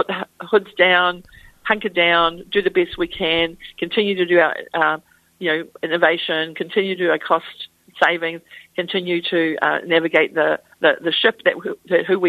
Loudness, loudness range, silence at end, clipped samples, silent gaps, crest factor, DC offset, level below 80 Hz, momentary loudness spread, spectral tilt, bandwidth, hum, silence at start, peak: -19 LUFS; 2 LU; 0 s; under 0.1%; none; 18 dB; under 0.1%; -54 dBFS; 11 LU; -5.5 dB/octave; 13.5 kHz; none; 0 s; 0 dBFS